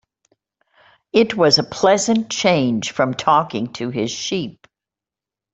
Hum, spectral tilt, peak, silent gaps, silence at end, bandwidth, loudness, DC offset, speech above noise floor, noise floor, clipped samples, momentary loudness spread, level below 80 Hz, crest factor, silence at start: none; -4 dB/octave; -2 dBFS; none; 1.05 s; 8.2 kHz; -18 LUFS; under 0.1%; 71 dB; -88 dBFS; under 0.1%; 10 LU; -58 dBFS; 18 dB; 1.15 s